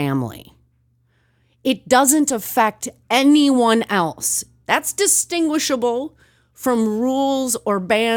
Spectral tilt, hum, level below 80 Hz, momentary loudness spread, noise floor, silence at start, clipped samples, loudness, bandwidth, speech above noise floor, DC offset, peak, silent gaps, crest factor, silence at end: -3 dB/octave; none; -60 dBFS; 10 LU; -61 dBFS; 0 s; under 0.1%; -18 LUFS; 19.5 kHz; 44 dB; under 0.1%; 0 dBFS; none; 18 dB; 0 s